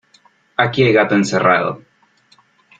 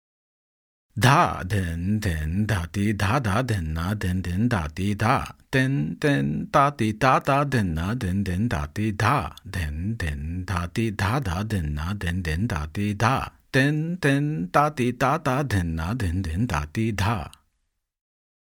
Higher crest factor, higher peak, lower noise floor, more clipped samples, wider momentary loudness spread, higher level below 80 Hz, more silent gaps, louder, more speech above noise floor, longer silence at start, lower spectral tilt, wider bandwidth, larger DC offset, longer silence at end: about the same, 16 dB vs 20 dB; about the same, -2 dBFS vs -4 dBFS; second, -55 dBFS vs -75 dBFS; neither; first, 12 LU vs 7 LU; second, -56 dBFS vs -42 dBFS; neither; first, -15 LUFS vs -24 LUFS; second, 40 dB vs 52 dB; second, 0.6 s vs 0.95 s; about the same, -5.5 dB/octave vs -6 dB/octave; second, 9.2 kHz vs 18 kHz; neither; second, 1.05 s vs 1.25 s